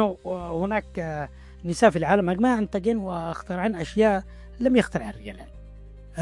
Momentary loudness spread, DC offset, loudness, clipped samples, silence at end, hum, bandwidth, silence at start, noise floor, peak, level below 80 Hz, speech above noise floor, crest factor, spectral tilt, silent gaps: 17 LU; under 0.1%; -24 LUFS; under 0.1%; 0 s; none; 11.5 kHz; 0 s; -43 dBFS; -4 dBFS; -44 dBFS; 19 dB; 20 dB; -6.5 dB/octave; none